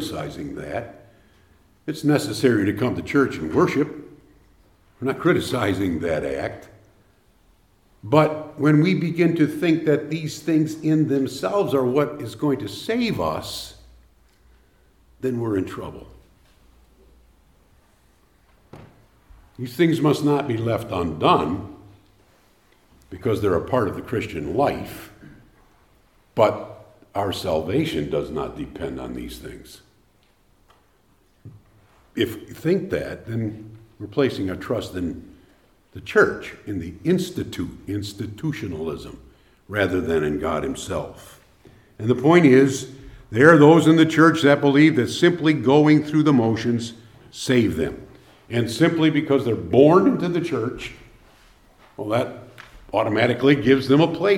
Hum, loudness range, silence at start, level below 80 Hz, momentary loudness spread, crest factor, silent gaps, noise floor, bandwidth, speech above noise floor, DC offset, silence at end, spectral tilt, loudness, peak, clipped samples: none; 13 LU; 0 s; -52 dBFS; 17 LU; 22 dB; none; -60 dBFS; 16.5 kHz; 40 dB; under 0.1%; 0 s; -6.5 dB/octave; -21 LUFS; 0 dBFS; under 0.1%